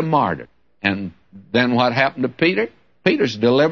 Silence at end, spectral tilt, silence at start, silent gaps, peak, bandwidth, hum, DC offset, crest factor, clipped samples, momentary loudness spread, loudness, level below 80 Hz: 0 s; -6.5 dB/octave; 0 s; none; -2 dBFS; 7 kHz; none; 0.1%; 16 dB; under 0.1%; 11 LU; -19 LUFS; -60 dBFS